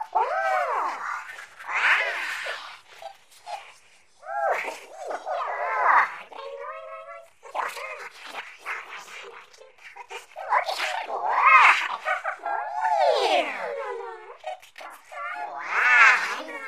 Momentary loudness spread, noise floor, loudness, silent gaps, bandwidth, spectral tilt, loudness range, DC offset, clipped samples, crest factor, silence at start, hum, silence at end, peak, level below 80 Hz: 23 LU; -57 dBFS; -23 LUFS; none; 15.5 kHz; 0.5 dB/octave; 14 LU; 0.1%; under 0.1%; 24 dB; 0 s; none; 0 s; -2 dBFS; -84 dBFS